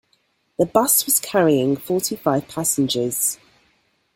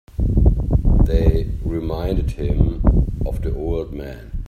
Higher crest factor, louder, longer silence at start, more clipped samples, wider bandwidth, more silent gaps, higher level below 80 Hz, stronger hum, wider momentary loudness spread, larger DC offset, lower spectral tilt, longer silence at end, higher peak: about the same, 20 dB vs 16 dB; about the same, -19 LUFS vs -20 LUFS; first, 0.6 s vs 0.15 s; neither; first, 17 kHz vs 4.7 kHz; neither; second, -60 dBFS vs -20 dBFS; neither; about the same, 7 LU vs 8 LU; neither; second, -3.5 dB/octave vs -9.5 dB/octave; first, 0.8 s vs 0 s; about the same, 0 dBFS vs 0 dBFS